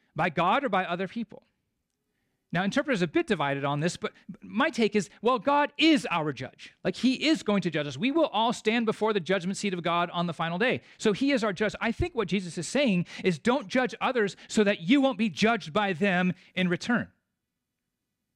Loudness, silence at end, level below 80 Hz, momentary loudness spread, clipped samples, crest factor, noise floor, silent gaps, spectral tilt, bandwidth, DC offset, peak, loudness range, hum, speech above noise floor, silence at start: -27 LUFS; 1.3 s; -56 dBFS; 7 LU; under 0.1%; 16 dB; -84 dBFS; none; -5 dB/octave; 11.5 kHz; under 0.1%; -12 dBFS; 3 LU; none; 57 dB; 0.15 s